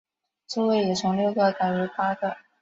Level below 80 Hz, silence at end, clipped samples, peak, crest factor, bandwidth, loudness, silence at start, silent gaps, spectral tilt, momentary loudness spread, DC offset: -66 dBFS; 0.25 s; under 0.1%; -10 dBFS; 16 dB; 7.8 kHz; -25 LUFS; 0.5 s; none; -5.5 dB/octave; 7 LU; under 0.1%